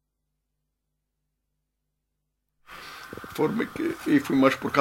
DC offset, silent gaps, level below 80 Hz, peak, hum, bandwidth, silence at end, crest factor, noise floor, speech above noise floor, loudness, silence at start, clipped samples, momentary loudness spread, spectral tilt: under 0.1%; none; -64 dBFS; -4 dBFS; none; 16 kHz; 0 s; 24 dB; -80 dBFS; 57 dB; -24 LUFS; 2.7 s; under 0.1%; 19 LU; -6 dB/octave